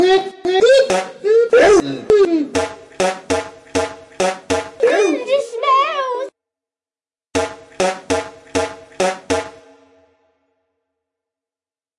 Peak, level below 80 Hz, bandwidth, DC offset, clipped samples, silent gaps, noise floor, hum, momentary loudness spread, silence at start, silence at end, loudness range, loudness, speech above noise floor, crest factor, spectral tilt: -2 dBFS; -50 dBFS; 11.5 kHz; under 0.1%; under 0.1%; none; under -90 dBFS; none; 12 LU; 0 s; 2.5 s; 10 LU; -17 LUFS; over 76 dB; 16 dB; -3.5 dB/octave